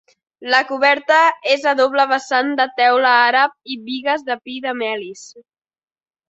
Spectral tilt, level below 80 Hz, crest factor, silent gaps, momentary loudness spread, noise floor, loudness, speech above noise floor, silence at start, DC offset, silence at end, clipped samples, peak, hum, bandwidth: -2 dB/octave; -72 dBFS; 16 dB; none; 13 LU; under -90 dBFS; -16 LUFS; over 73 dB; 0.4 s; under 0.1%; 0.9 s; under 0.1%; 0 dBFS; none; 8.2 kHz